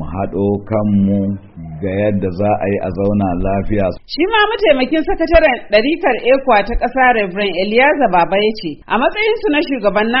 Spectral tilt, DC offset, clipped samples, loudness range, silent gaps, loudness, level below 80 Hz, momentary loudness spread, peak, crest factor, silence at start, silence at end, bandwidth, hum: -4 dB/octave; under 0.1%; under 0.1%; 4 LU; none; -15 LUFS; -30 dBFS; 7 LU; 0 dBFS; 14 dB; 0 s; 0 s; 5.8 kHz; none